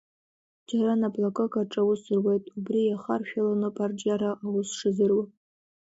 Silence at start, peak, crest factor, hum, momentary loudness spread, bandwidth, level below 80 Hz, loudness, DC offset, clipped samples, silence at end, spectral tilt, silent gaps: 0.7 s; -12 dBFS; 16 dB; none; 5 LU; 8 kHz; -72 dBFS; -27 LUFS; under 0.1%; under 0.1%; 0.65 s; -6.5 dB/octave; none